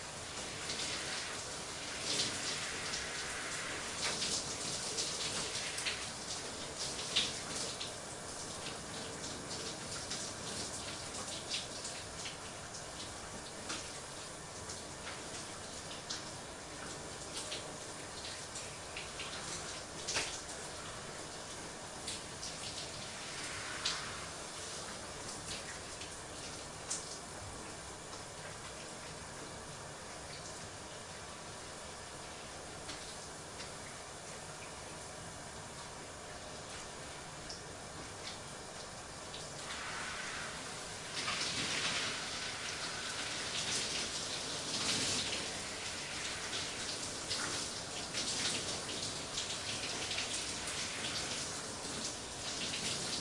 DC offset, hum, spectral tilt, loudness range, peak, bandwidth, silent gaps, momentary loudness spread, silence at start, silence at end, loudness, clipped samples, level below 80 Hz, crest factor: under 0.1%; none; -1.5 dB/octave; 9 LU; -18 dBFS; 12 kHz; none; 11 LU; 0 s; 0 s; -40 LUFS; under 0.1%; -64 dBFS; 26 dB